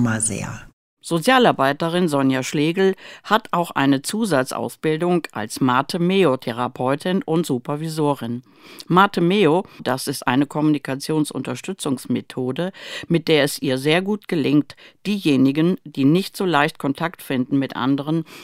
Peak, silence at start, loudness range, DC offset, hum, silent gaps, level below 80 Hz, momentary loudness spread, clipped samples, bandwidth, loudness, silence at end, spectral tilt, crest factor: -2 dBFS; 0 s; 3 LU; under 0.1%; none; 0.73-0.97 s; -58 dBFS; 9 LU; under 0.1%; 16 kHz; -20 LUFS; 0 s; -5 dB/octave; 18 dB